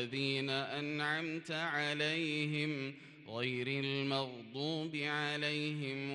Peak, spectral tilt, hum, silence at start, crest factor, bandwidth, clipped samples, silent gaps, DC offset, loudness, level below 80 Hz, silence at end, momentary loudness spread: -22 dBFS; -5 dB/octave; none; 0 s; 16 dB; 11.5 kHz; under 0.1%; none; under 0.1%; -37 LUFS; -82 dBFS; 0 s; 6 LU